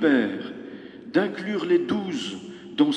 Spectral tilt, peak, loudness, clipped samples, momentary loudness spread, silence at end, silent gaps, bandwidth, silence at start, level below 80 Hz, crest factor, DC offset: -5.5 dB/octave; -6 dBFS; -25 LUFS; under 0.1%; 16 LU; 0 s; none; 9.2 kHz; 0 s; -70 dBFS; 18 dB; under 0.1%